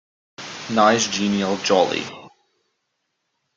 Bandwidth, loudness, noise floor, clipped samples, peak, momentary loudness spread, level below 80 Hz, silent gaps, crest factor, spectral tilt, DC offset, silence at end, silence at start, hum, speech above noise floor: 9.2 kHz; -19 LUFS; -75 dBFS; under 0.1%; -2 dBFS; 18 LU; -62 dBFS; none; 20 dB; -3.5 dB/octave; under 0.1%; 1.3 s; 0.4 s; none; 56 dB